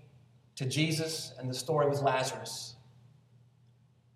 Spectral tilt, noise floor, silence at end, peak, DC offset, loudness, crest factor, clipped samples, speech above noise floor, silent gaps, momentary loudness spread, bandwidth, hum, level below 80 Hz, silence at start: -4.5 dB/octave; -64 dBFS; 1.4 s; -16 dBFS; under 0.1%; -32 LUFS; 20 dB; under 0.1%; 32 dB; none; 12 LU; 15.5 kHz; none; -76 dBFS; 0.55 s